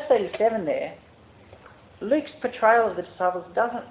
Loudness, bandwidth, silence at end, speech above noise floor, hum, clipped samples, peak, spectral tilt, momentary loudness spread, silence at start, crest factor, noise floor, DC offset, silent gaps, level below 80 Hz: -24 LUFS; 4 kHz; 0 s; 27 dB; none; under 0.1%; -6 dBFS; -9 dB/octave; 11 LU; 0 s; 18 dB; -50 dBFS; under 0.1%; none; -60 dBFS